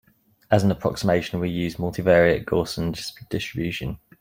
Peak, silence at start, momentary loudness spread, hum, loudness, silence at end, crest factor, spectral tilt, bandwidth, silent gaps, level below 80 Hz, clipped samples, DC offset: -2 dBFS; 0.5 s; 12 LU; none; -23 LUFS; 0.25 s; 20 dB; -6 dB/octave; 16.5 kHz; none; -46 dBFS; under 0.1%; under 0.1%